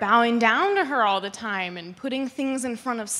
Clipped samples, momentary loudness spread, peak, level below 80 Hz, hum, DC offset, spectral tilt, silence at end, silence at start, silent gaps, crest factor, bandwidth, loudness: under 0.1%; 10 LU; -4 dBFS; -70 dBFS; none; under 0.1%; -3 dB/octave; 0 s; 0 s; none; 20 dB; 14 kHz; -23 LUFS